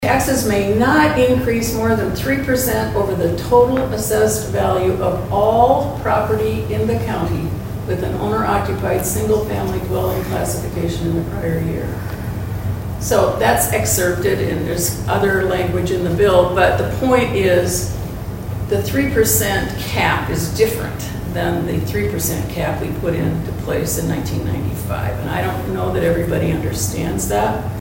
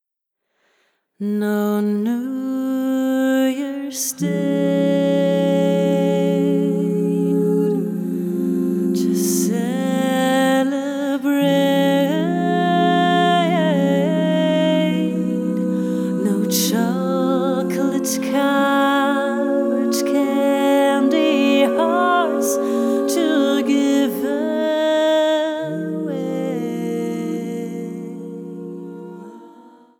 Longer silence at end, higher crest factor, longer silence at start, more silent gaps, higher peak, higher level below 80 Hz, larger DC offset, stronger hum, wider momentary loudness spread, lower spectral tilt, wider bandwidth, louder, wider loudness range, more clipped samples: second, 0 s vs 0.5 s; about the same, 18 dB vs 14 dB; second, 0 s vs 1.2 s; neither; first, 0 dBFS vs -4 dBFS; first, -32 dBFS vs -68 dBFS; neither; neither; about the same, 8 LU vs 8 LU; about the same, -5 dB/octave vs -5.5 dB/octave; about the same, 16.5 kHz vs 18 kHz; about the same, -18 LUFS vs -19 LUFS; about the same, 5 LU vs 4 LU; neither